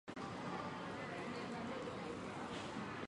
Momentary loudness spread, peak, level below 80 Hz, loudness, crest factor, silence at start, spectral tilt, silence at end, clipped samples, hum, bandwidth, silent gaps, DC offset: 1 LU; -32 dBFS; -70 dBFS; -46 LUFS; 14 dB; 0.05 s; -5.5 dB/octave; 0 s; under 0.1%; none; 11 kHz; none; under 0.1%